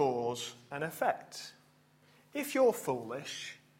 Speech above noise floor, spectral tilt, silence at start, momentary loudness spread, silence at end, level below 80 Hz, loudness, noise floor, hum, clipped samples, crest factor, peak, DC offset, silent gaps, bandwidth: 32 dB; -4 dB/octave; 0 s; 15 LU; 0.2 s; -78 dBFS; -35 LUFS; -65 dBFS; none; under 0.1%; 18 dB; -16 dBFS; under 0.1%; none; 16.5 kHz